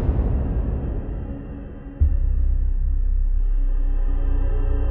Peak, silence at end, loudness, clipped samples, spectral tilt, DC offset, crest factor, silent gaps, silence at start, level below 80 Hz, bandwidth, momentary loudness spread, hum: -8 dBFS; 0 s; -26 LUFS; under 0.1%; -12.5 dB/octave; under 0.1%; 12 dB; none; 0 s; -20 dBFS; 2.8 kHz; 9 LU; none